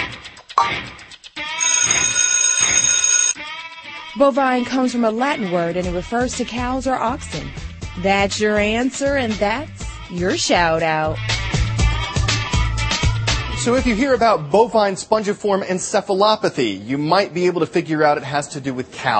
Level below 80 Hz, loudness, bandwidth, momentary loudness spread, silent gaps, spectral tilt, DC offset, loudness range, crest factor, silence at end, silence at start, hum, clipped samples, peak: -32 dBFS; -18 LUFS; 8.8 kHz; 13 LU; none; -3 dB/octave; under 0.1%; 5 LU; 18 dB; 0 s; 0 s; none; under 0.1%; 0 dBFS